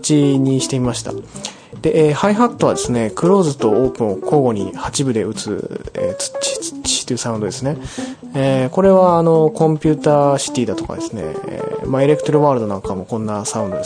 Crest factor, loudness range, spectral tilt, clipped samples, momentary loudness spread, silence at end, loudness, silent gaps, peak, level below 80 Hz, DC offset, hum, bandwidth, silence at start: 16 dB; 5 LU; -5.5 dB/octave; under 0.1%; 11 LU; 0 s; -17 LUFS; none; 0 dBFS; -44 dBFS; under 0.1%; none; 10.5 kHz; 0 s